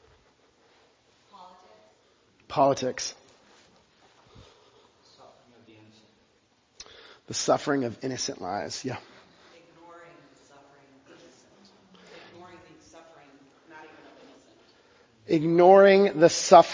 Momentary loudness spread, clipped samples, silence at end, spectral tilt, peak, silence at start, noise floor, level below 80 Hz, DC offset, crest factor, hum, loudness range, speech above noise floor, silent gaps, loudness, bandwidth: 30 LU; under 0.1%; 0 s; -4.5 dB/octave; -2 dBFS; 2.5 s; -66 dBFS; -68 dBFS; under 0.1%; 26 dB; none; 28 LU; 45 dB; none; -22 LUFS; 7.6 kHz